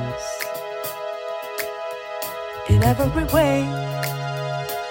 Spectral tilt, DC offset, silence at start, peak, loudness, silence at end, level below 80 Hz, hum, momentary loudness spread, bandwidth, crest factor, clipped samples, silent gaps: -6 dB/octave; under 0.1%; 0 s; -4 dBFS; -24 LUFS; 0 s; -36 dBFS; none; 11 LU; 17 kHz; 18 dB; under 0.1%; none